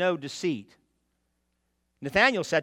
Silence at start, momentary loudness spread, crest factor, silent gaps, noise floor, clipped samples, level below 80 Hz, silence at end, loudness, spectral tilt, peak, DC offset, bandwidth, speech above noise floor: 0 s; 14 LU; 22 dB; none; -76 dBFS; under 0.1%; -62 dBFS; 0 s; -25 LUFS; -4 dB/octave; -6 dBFS; under 0.1%; 16.5 kHz; 50 dB